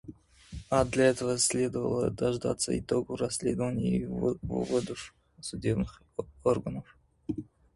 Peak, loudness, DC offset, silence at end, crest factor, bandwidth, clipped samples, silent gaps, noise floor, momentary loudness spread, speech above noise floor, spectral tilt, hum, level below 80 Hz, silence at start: -10 dBFS; -30 LUFS; under 0.1%; 0.3 s; 20 dB; 11.5 kHz; under 0.1%; none; -50 dBFS; 16 LU; 21 dB; -5 dB/octave; none; -50 dBFS; 0.05 s